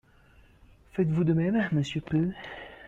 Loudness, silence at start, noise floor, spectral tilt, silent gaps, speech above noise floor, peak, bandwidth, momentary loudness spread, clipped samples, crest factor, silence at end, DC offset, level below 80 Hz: -28 LUFS; 0.95 s; -58 dBFS; -8 dB/octave; none; 31 dB; -14 dBFS; 7.8 kHz; 14 LU; under 0.1%; 16 dB; 0 s; under 0.1%; -56 dBFS